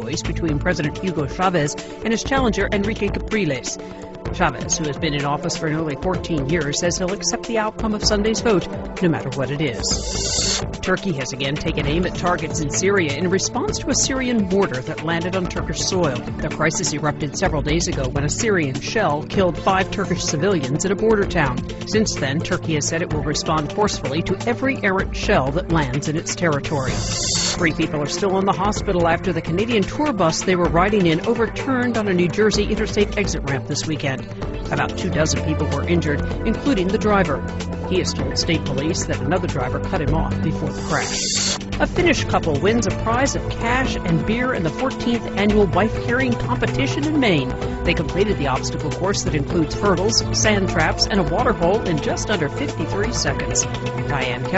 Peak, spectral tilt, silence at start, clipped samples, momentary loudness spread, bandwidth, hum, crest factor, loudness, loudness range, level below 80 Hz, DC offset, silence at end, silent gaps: -2 dBFS; -4.5 dB/octave; 0 s; under 0.1%; 5 LU; 8.2 kHz; none; 18 dB; -20 LUFS; 3 LU; -34 dBFS; under 0.1%; 0 s; none